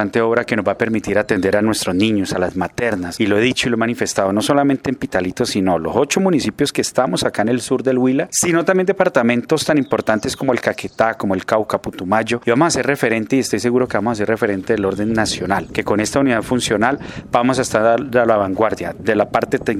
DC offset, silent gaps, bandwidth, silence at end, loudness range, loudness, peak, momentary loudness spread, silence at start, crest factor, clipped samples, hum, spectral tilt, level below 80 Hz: under 0.1%; none; 15.5 kHz; 0 s; 2 LU; -17 LUFS; 0 dBFS; 5 LU; 0 s; 16 dB; under 0.1%; none; -4.5 dB/octave; -48 dBFS